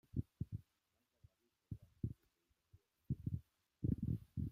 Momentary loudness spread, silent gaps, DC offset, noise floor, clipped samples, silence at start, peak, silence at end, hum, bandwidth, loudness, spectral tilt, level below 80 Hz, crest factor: 13 LU; none; under 0.1%; -85 dBFS; under 0.1%; 0.15 s; -26 dBFS; 0 s; none; 4.8 kHz; -47 LUFS; -11 dB/octave; -60 dBFS; 22 dB